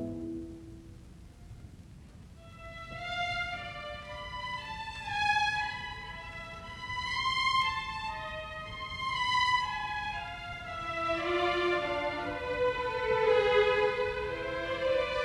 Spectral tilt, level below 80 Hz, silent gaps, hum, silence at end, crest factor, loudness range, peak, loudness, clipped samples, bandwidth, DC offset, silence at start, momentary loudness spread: -4 dB/octave; -52 dBFS; none; none; 0 s; 18 dB; 10 LU; -14 dBFS; -32 LUFS; under 0.1%; 12 kHz; under 0.1%; 0 s; 21 LU